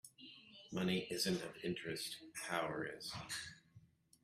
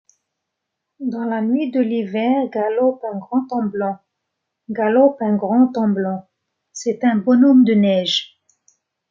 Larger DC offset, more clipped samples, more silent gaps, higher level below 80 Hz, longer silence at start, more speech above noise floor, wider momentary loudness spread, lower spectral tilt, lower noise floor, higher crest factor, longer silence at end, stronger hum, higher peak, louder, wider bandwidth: neither; neither; neither; about the same, -74 dBFS vs -70 dBFS; second, 0.05 s vs 1 s; second, 25 dB vs 62 dB; first, 18 LU vs 14 LU; second, -4 dB/octave vs -6 dB/octave; second, -67 dBFS vs -79 dBFS; first, 22 dB vs 16 dB; second, 0.45 s vs 0.85 s; neither; second, -22 dBFS vs -2 dBFS; second, -42 LUFS vs -18 LUFS; first, 15.5 kHz vs 7.6 kHz